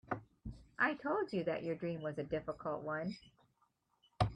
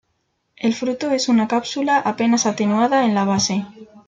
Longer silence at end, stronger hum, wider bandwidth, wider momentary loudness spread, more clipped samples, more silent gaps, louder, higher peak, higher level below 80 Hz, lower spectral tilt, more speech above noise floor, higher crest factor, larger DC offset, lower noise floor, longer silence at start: about the same, 0 s vs 0.1 s; neither; first, 10.5 kHz vs 9 kHz; first, 15 LU vs 6 LU; neither; neither; second, -39 LUFS vs -19 LUFS; second, -18 dBFS vs -6 dBFS; about the same, -60 dBFS vs -62 dBFS; first, -7.5 dB/octave vs -4 dB/octave; second, 40 dB vs 51 dB; first, 22 dB vs 12 dB; neither; first, -79 dBFS vs -70 dBFS; second, 0.1 s vs 0.6 s